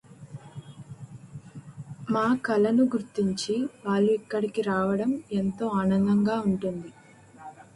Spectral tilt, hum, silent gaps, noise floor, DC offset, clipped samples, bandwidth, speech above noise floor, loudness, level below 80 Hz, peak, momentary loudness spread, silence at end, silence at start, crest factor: -7 dB/octave; none; none; -48 dBFS; under 0.1%; under 0.1%; 11.5 kHz; 23 dB; -26 LUFS; -62 dBFS; -12 dBFS; 22 LU; 0.15 s; 0.1 s; 14 dB